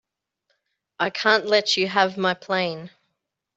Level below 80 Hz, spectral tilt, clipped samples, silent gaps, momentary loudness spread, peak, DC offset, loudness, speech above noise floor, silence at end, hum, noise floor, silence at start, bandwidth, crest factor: -72 dBFS; -3.5 dB/octave; under 0.1%; none; 9 LU; -2 dBFS; under 0.1%; -21 LUFS; 57 dB; 0.7 s; none; -79 dBFS; 1 s; 8.2 kHz; 22 dB